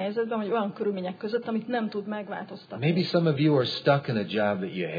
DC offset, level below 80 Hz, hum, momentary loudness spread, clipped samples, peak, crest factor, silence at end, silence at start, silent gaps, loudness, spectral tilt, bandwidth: under 0.1%; -72 dBFS; none; 10 LU; under 0.1%; -8 dBFS; 18 dB; 0 s; 0 s; none; -27 LUFS; -8 dB/octave; 5 kHz